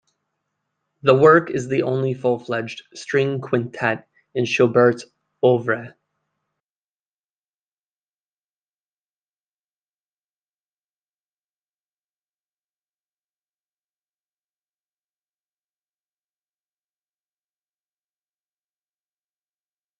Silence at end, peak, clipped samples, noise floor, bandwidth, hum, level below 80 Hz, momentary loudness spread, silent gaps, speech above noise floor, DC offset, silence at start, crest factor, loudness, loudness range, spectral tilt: 14.1 s; -2 dBFS; under 0.1%; under -90 dBFS; 9.2 kHz; 50 Hz at -70 dBFS; -70 dBFS; 13 LU; none; over 71 dB; under 0.1%; 1.05 s; 24 dB; -19 LUFS; 7 LU; -6.5 dB/octave